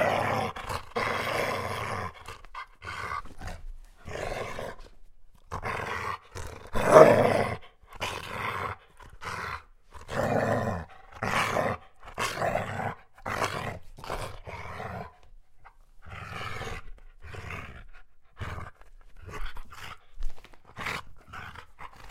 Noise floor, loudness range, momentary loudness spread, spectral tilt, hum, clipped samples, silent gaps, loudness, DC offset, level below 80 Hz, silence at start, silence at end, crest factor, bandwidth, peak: -51 dBFS; 18 LU; 18 LU; -5 dB/octave; none; under 0.1%; none; -29 LUFS; under 0.1%; -46 dBFS; 0 s; 0 s; 30 dB; 16 kHz; 0 dBFS